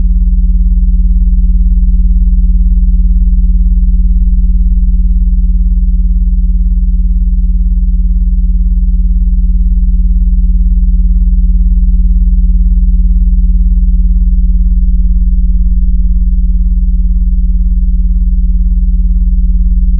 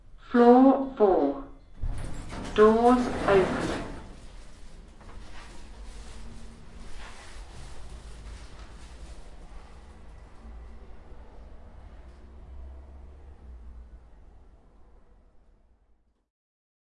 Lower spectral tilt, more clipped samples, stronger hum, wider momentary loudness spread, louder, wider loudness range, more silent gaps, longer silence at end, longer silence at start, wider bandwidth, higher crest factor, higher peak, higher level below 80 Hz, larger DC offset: first, -13.5 dB/octave vs -6.5 dB/octave; neither; neither; second, 2 LU vs 29 LU; first, -12 LUFS vs -23 LUFS; second, 1 LU vs 26 LU; neither; second, 0 s vs 2.95 s; second, 0 s vs 0.15 s; second, 0.2 kHz vs 11.5 kHz; second, 6 dB vs 22 dB; first, 0 dBFS vs -6 dBFS; first, -8 dBFS vs -44 dBFS; neither